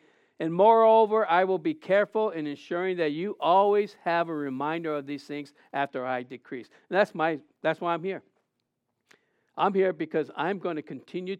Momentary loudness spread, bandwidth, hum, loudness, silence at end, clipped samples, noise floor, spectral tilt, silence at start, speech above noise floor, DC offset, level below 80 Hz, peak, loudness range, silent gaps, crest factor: 15 LU; 9.2 kHz; none; -26 LUFS; 0.05 s; under 0.1%; -80 dBFS; -7 dB/octave; 0.4 s; 54 dB; under 0.1%; under -90 dBFS; -8 dBFS; 7 LU; none; 20 dB